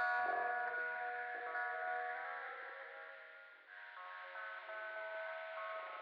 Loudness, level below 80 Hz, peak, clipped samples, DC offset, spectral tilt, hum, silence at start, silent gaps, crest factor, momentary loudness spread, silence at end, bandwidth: -43 LUFS; under -90 dBFS; -28 dBFS; under 0.1%; under 0.1%; 2.5 dB/octave; none; 0 s; none; 16 dB; 15 LU; 0 s; 5.6 kHz